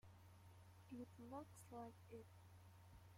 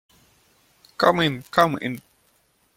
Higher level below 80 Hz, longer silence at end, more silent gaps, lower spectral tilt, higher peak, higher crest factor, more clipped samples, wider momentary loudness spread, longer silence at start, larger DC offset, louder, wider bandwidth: second, -80 dBFS vs -60 dBFS; second, 0 s vs 0.8 s; neither; about the same, -6.5 dB/octave vs -5.5 dB/octave; second, -42 dBFS vs -2 dBFS; second, 18 dB vs 24 dB; neither; about the same, 10 LU vs 12 LU; second, 0.05 s vs 1 s; neither; second, -61 LUFS vs -21 LUFS; about the same, 16.5 kHz vs 16.5 kHz